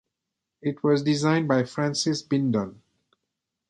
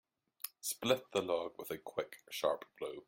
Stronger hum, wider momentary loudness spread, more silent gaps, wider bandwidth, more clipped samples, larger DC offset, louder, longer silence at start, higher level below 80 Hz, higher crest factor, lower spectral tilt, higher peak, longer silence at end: neither; about the same, 9 LU vs 11 LU; neither; second, 11 kHz vs 16.5 kHz; neither; neither; first, -25 LUFS vs -39 LUFS; first, 0.65 s vs 0.45 s; first, -66 dBFS vs -78 dBFS; about the same, 18 dB vs 22 dB; first, -5.5 dB/octave vs -3 dB/octave; first, -8 dBFS vs -18 dBFS; first, 1 s vs 0.05 s